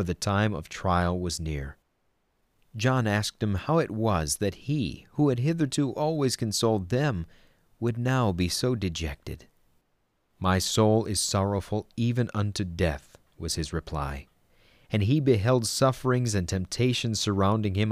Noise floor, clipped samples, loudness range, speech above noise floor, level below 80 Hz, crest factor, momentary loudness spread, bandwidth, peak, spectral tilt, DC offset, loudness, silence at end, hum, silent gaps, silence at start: -72 dBFS; under 0.1%; 4 LU; 46 dB; -46 dBFS; 18 dB; 10 LU; 15.5 kHz; -10 dBFS; -5 dB/octave; under 0.1%; -27 LUFS; 0 s; none; none; 0 s